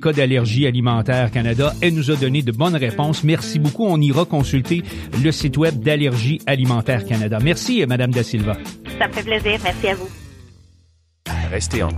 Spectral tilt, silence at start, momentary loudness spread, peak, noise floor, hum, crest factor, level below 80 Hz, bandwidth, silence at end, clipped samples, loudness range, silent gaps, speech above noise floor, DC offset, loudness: -6 dB/octave; 0 s; 6 LU; -4 dBFS; -56 dBFS; none; 14 dB; -38 dBFS; 15.5 kHz; 0 s; under 0.1%; 4 LU; none; 38 dB; under 0.1%; -19 LUFS